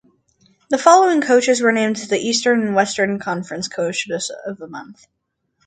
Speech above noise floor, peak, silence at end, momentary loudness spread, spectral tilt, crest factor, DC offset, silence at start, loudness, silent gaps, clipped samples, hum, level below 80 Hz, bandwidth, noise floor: 49 dB; 0 dBFS; 0.75 s; 17 LU; -3.5 dB/octave; 18 dB; under 0.1%; 0.7 s; -17 LUFS; none; under 0.1%; none; -66 dBFS; 9.4 kHz; -67 dBFS